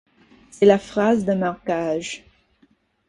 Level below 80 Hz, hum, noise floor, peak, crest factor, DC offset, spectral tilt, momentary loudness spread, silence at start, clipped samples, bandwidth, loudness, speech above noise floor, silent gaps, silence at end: -58 dBFS; none; -61 dBFS; -2 dBFS; 20 dB; under 0.1%; -6 dB/octave; 12 LU; 0.55 s; under 0.1%; 11 kHz; -20 LUFS; 41 dB; none; 0.9 s